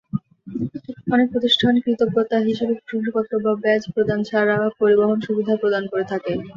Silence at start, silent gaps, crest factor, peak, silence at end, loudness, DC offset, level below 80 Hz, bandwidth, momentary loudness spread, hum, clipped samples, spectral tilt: 0.15 s; none; 16 dB; -4 dBFS; 0.05 s; -20 LUFS; under 0.1%; -56 dBFS; 7.4 kHz; 12 LU; none; under 0.1%; -6.5 dB/octave